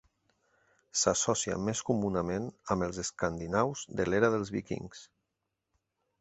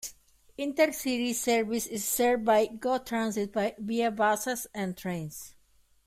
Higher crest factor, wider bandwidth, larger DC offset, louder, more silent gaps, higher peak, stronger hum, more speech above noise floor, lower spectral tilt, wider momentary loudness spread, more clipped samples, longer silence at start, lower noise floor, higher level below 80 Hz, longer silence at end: first, 24 dB vs 18 dB; second, 8.4 kHz vs 16 kHz; neither; about the same, -31 LUFS vs -29 LUFS; neither; about the same, -10 dBFS vs -10 dBFS; neither; first, 53 dB vs 35 dB; about the same, -4 dB/octave vs -3.5 dB/octave; about the same, 9 LU vs 11 LU; neither; first, 0.95 s vs 0 s; first, -85 dBFS vs -64 dBFS; first, -56 dBFS vs -64 dBFS; first, 1.15 s vs 0.55 s